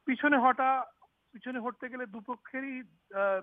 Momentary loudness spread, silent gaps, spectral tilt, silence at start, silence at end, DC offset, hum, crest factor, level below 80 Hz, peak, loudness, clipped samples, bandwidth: 17 LU; none; -7.5 dB/octave; 0.05 s; 0 s; under 0.1%; none; 20 dB; -80 dBFS; -12 dBFS; -31 LUFS; under 0.1%; 3.8 kHz